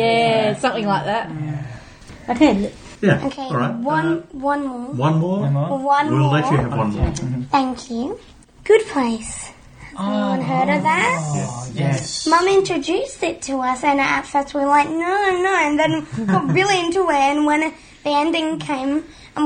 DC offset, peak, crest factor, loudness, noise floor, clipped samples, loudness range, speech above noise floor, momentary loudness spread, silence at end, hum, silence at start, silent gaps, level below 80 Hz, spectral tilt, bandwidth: under 0.1%; 0 dBFS; 18 dB; -19 LUFS; -40 dBFS; under 0.1%; 3 LU; 21 dB; 10 LU; 0 s; none; 0 s; none; -42 dBFS; -5.5 dB/octave; 9.8 kHz